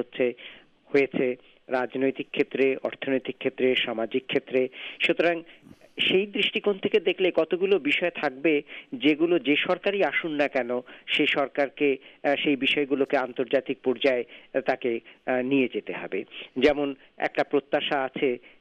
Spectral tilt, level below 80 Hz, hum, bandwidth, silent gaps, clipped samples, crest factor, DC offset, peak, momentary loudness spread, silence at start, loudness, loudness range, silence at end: -6 dB/octave; -66 dBFS; none; 8.6 kHz; none; under 0.1%; 16 dB; under 0.1%; -10 dBFS; 8 LU; 0 s; -26 LUFS; 3 LU; 0.25 s